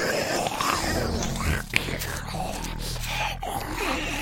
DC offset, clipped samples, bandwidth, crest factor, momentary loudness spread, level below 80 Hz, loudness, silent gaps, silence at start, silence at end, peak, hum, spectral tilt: under 0.1%; under 0.1%; 17 kHz; 26 dB; 7 LU; -36 dBFS; -27 LUFS; none; 0 s; 0 s; -2 dBFS; none; -3.5 dB/octave